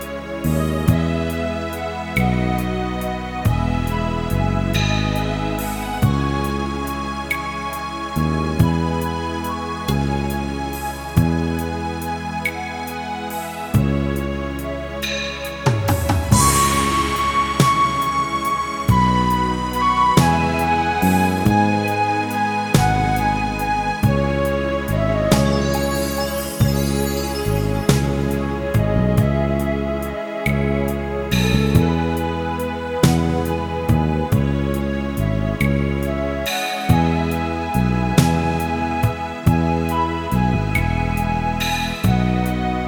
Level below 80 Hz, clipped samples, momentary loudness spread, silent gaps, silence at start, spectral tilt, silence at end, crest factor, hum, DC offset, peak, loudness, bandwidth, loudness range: -30 dBFS; under 0.1%; 8 LU; none; 0 s; -5.5 dB/octave; 0 s; 20 dB; none; under 0.1%; 0 dBFS; -20 LUFS; 19.5 kHz; 5 LU